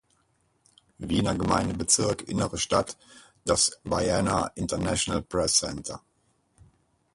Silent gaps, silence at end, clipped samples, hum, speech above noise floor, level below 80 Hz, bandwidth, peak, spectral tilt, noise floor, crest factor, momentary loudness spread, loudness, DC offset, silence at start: none; 1.2 s; under 0.1%; none; 43 dB; -46 dBFS; 11.5 kHz; -6 dBFS; -3.5 dB/octave; -69 dBFS; 22 dB; 14 LU; -26 LUFS; under 0.1%; 1 s